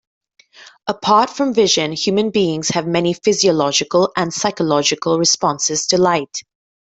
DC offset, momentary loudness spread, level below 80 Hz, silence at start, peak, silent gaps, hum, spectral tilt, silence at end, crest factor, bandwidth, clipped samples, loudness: under 0.1%; 6 LU; -58 dBFS; 0.6 s; -2 dBFS; none; none; -3.5 dB/octave; 0.55 s; 16 dB; 8.4 kHz; under 0.1%; -16 LUFS